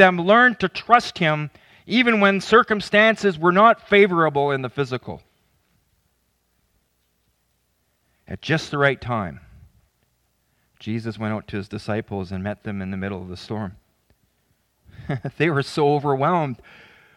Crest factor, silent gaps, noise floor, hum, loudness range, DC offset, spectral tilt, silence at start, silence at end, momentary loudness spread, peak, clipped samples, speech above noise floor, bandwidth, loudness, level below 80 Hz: 22 dB; none; -68 dBFS; none; 14 LU; under 0.1%; -6 dB/octave; 0 s; 0.6 s; 16 LU; 0 dBFS; under 0.1%; 49 dB; 11.5 kHz; -20 LUFS; -58 dBFS